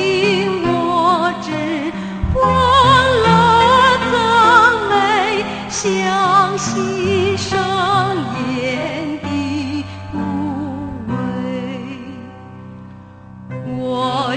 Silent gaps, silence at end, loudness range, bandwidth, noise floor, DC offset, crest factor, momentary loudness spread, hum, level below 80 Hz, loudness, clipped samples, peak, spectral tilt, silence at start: none; 0 s; 13 LU; 9.2 kHz; -37 dBFS; under 0.1%; 16 dB; 16 LU; none; -38 dBFS; -15 LUFS; under 0.1%; 0 dBFS; -4.5 dB/octave; 0 s